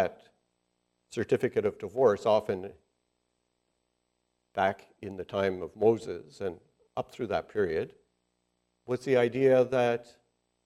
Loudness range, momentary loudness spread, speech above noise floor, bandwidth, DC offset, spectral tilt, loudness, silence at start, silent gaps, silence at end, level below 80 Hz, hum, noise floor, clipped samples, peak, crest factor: 6 LU; 16 LU; 50 dB; 12 kHz; under 0.1%; -6.5 dB/octave; -29 LUFS; 0 s; none; 0.6 s; -70 dBFS; 60 Hz at -70 dBFS; -79 dBFS; under 0.1%; -10 dBFS; 20 dB